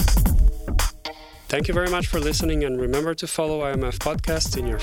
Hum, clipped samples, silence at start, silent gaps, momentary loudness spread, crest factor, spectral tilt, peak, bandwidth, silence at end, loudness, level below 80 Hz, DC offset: none; under 0.1%; 0 s; none; 6 LU; 16 dB; -4.5 dB/octave; -6 dBFS; 17.5 kHz; 0 s; -24 LUFS; -24 dBFS; under 0.1%